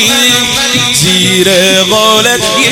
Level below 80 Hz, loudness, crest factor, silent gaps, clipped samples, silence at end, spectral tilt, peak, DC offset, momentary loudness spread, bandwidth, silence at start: -40 dBFS; -6 LUFS; 8 dB; none; 0.4%; 0 s; -2 dB/octave; 0 dBFS; under 0.1%; 2 LU; 17.5 kHz; 0 s